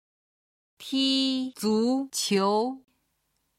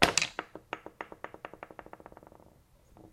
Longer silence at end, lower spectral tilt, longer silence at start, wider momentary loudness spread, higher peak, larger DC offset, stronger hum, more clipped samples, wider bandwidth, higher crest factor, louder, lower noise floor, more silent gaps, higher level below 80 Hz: first, 0.8 s vs 0.05 s; first, -4 dB/octave vs -1.5 dB/octave; first, 0.8 s vs 0 s; second, 9 LU vs 23 LU; second, -12 dBFS vs -4 dBFS; neither; neither; neither; about the same, 15.5 kHz vs 16 kHz; second, 16 dB vs 34 dB; first, -26 LUFS vs -36 LUFS; first, -75 dBFS vs -61 dBFS; neither; second, -74 dBFS vs -58 dBFS